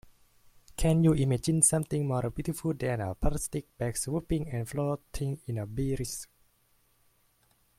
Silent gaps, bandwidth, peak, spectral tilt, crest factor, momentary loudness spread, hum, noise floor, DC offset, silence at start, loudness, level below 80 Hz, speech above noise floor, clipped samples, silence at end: none; 16 kHz; -8 dBFS; -5.5 dB/octave; 22 dB; 12 LU; none; -68 dBFS; under 0.1%; 0.7 s; -30 LUFS; -44 dBFS; 39 dB; under 0.1%; 1.55 s